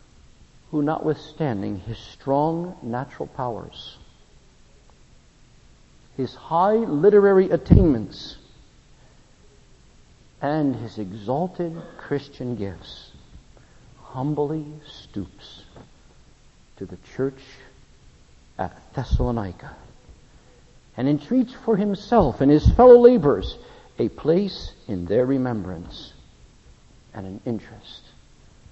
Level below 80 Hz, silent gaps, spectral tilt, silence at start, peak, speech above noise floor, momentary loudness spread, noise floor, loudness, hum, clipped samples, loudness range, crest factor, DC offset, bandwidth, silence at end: -36 dBFS; none; -8.5 dB/octave; 0.75 s; 0 dBFS; 31 dB; 23 LU; -52 dBFS; -21 LUFS; none; under 0.1%; 18 LU; 24 dB; under 0.1%; 8 kHz; 0.75 s